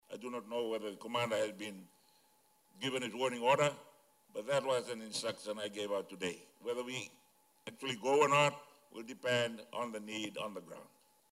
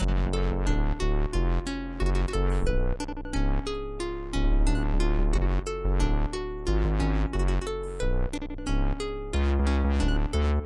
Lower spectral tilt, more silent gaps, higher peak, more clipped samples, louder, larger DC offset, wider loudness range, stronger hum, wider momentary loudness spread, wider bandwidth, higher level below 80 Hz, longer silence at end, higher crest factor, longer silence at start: second, -3.5 dB/octave vs -6.5 dB/octave; neither; second, -16 dBFS vs -12 dBFS; neither; second, -37 LUFS vs -29 LUFS; neither; first, 5 LU vs 2 LU; neither; first, 19 LU vs 7 LU; first, 16 kHz vs 11 kHz; second, -86 dBFS vs -26 dBFS; first, 0.45 s vs 0 s; first, 22 dB vs 12 dB; about the same, 0.1 s vs 0 s